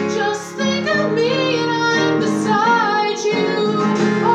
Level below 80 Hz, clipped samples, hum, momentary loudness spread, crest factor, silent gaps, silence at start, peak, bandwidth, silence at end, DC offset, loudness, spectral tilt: -72 dBFS; under 0.1%; none; 5 LU; 12 dB; none; 0 s; -4 dBFS; 12 kHz; 0 s; under 0.1%; -17 LUFS; -5 dB/octave